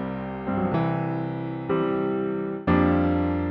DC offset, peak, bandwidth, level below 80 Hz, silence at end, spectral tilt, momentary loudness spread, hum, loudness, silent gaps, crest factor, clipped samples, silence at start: under 0.1%; -8 dBFS; 5.2 kHz; -44 dBFS; 0 s; -11 dB/octave; 9 LU; none; -25 LUFS; none; 18 dB; under 0.1%; 0 s